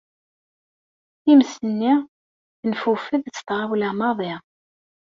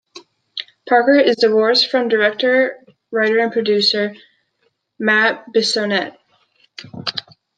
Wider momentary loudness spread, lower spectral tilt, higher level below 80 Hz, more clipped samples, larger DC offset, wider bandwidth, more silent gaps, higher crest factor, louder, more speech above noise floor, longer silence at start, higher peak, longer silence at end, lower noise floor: second, 13 LU vs 17 LU; first, -5.5 dB/octave vs -3.5 dB/octave; about the same, -68 dBFS vs -70 dBFS; neither; neither; second, 7.4 kHz vs 9.2 kHz; first, 2.08-2.63 s vs none; about the same, 18 dB vs 16 dB; second, -21 LUFS vs -16 LUFS; first, over 70 dB vs 50 dB; first, 1.25 s vs 0.15 s; about the same, -4 dBFS vs -2 dBFS; first, 0.65 s vs 0.35 s; first, under -90 dBFS vs -66 dBFS